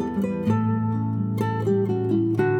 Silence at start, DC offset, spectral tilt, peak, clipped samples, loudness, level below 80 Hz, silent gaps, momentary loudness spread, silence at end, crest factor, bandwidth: 0 s; under 0.1%; -9.5 dB/octave; -10 dBFS; under 0.1%; -24 LUFS; -54 dBFS; none; 3 LU; 0 s; 12 dB; 8.4 kHz